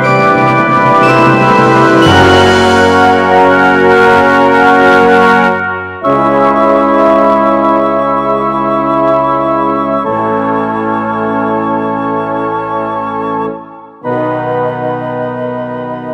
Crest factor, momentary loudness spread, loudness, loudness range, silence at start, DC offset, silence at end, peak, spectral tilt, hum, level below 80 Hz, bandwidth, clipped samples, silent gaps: 10 dB; 10 LU; -9 LUFS; 9 LU; 0 s; under 0.1%; 0 s; 0 dBFS; -6 dB/octave; none; -40 dBFS; 15 kHz; 0.6%; none